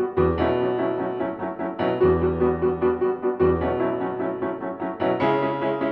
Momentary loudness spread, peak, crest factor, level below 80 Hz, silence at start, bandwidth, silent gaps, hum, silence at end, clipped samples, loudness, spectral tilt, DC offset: 7 LU; -8 dBFS; 16 dB; -46 dBFS; 0 s; 4.7 kHz; none; none; 0 s; under 0.1%; -23 LUFS; -10 dB/octave; under 0.1%